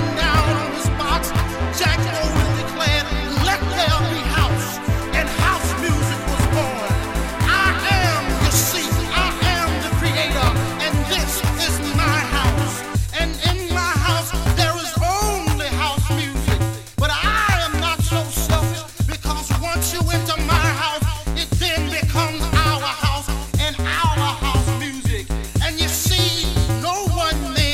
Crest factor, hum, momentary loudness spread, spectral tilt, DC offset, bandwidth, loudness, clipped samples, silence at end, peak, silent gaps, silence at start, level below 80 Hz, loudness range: 16 dB; none; 5 LU; -4 dB/octave; under 0.1%; 17 kHz; -19 LUFS; under 0.1%; 0 s; -2 dBFS; none; 0 s; -26 dBFS; 2 LU